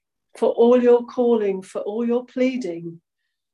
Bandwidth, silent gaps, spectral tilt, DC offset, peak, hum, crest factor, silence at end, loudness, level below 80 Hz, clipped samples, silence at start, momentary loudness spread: 10.5 kHz; none; -6.5 dB/octave; under 0.1%; -6 dBFS; none; 14 dB; 0.55 s; -20 LUFS; -74 dBFS; under 0.1%; 0.35 s; 13 LU